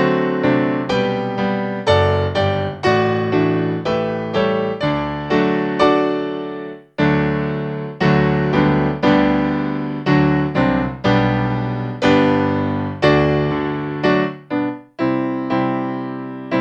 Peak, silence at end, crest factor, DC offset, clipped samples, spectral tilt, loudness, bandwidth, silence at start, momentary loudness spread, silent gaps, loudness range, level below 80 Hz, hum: 0 dBFS; 0 s; 18 dB; under 0.1%; under 0.1%; -7.5 dB/octave; -18 LUFS; 8.4 kHz; 0 s; 8 LU; none; 2 LU; -42 dBFS; none